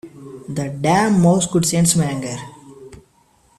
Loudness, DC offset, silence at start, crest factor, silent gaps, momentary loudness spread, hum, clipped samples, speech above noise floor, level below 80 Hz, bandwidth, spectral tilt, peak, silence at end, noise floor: -17 LUFS; under 0.1%; 0.05 s; 16 dB; none; 20 LU; none; under 0.1%; 40 dB; -50 dBFS; 14 kHz; -5 dB/octave; -2 dBFS; 0.65 s; -56 dBFS